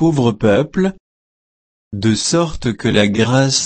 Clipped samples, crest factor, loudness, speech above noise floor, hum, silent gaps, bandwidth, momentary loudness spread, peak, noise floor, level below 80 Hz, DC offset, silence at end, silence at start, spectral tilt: under 0.1%; 16 dB; -16 LUFS; over 75 dB; none; 1.00-1.91 s; 8.8 kHz; 6 LU; 0 dBFS; under -90 dBFS; -40 dBFS; under 0.1%; 0 s; 0 s; -5 dB/octave